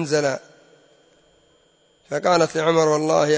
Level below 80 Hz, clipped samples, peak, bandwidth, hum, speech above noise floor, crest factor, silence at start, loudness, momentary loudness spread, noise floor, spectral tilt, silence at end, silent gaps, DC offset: -68 dBFS; under 0.1%; -6 dBFS; 8 kHz; none; 41 dB; 16 dB; 0 s; -20 LUFS; 10 LU; -60 dBFS; -4.5 dB/octave; 0 s; none; under 0.1%